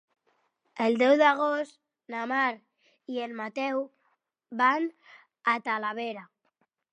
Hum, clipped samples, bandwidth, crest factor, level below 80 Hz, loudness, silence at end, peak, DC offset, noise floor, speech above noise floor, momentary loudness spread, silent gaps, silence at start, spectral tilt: none; under 0.1%; 9.6 kHz; 20 dB; -88 dBFS; -27 LUFS; 0.7 s; -8 dBFS; under 0.1%; -75 dBFS; 48 dB; 18 LU; none; 0.75 s; -4.5 dB/octave